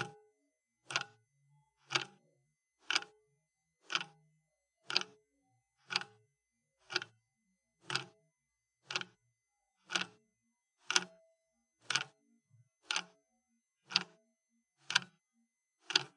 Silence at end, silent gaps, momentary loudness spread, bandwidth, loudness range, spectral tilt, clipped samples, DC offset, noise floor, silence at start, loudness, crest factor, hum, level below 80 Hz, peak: 0.1 s; none; 16 LU; 11 kHz; 4 LU; -0.5 dB/octave; under 0.1%; under 0.1%; -87 dBFS; 0 s; -37 LUFS; 34 dB; none; under -90 dBFS; -8 dBFS